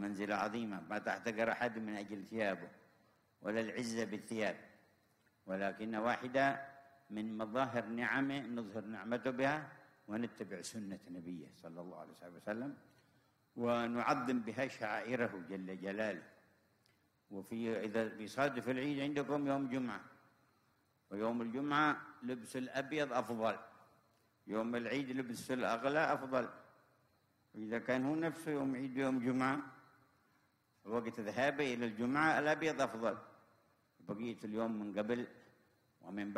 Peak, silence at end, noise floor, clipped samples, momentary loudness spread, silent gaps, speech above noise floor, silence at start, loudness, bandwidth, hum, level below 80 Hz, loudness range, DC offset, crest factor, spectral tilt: -20 dBFS; 0 s; -76 dBFS; under 0.1%; 14 LU; none; 37 dB; 0 s; -39 LUFS; 15.5 kHz; none; -80 dBFS; 5 LU; under 0.1%; 20 dB; -5.5 dB/octave